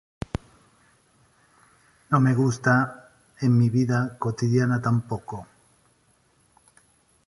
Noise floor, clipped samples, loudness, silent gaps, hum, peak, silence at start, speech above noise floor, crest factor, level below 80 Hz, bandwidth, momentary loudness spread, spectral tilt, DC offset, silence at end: -64 dBFS; under 0.1%; -24 LUFS; none; none; -6 dBFS; 2.1 s; 42 dB; 20 dB; -52 dBFS; 11.5 kHz; 14 LU; -7.5 dB/octave; under 0.1%; 1.85 s